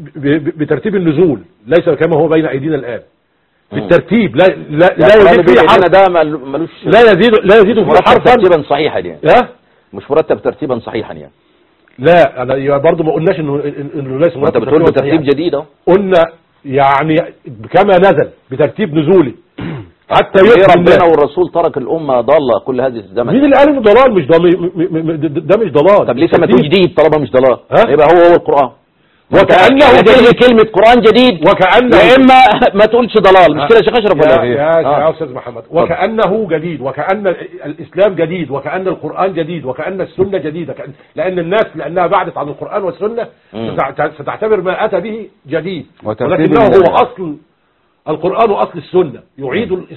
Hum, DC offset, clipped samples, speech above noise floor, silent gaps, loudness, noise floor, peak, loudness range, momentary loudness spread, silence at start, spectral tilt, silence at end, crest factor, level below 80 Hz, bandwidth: none; under 0.1%; 0.9%; 48 dB; none; -9 LUFS; -58 dBFS; 0 dBFS; 10 LU; 14 LU; 0 s; -7.5 dB/octave; 0 s; 10 dB; -40 dBFS; 9.2 kHz